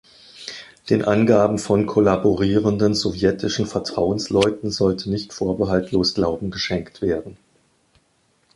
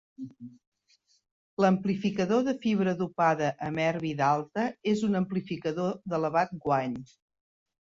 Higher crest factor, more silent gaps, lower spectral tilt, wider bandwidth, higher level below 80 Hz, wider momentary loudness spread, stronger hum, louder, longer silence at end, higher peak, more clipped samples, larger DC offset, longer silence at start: about the same, 18 dB vs 18 dB; second, none vs 0.67-0.72 s, 1.31-1.57 s; about the same, -6 dB/octave vs -7 dB/octave; first, 11.5 kHz vs 7.6 kHz; first, -46 dBFS vs -66 dBFS; second, 8 LU vs 14 LU; neither; first, -20 LUFS vs -28 LUFS; first, 1.2 s vs 0.85 s; first, -2 dBFS vs -12 dBFS; neither; neither; first, 0.35 s vs 0.2 s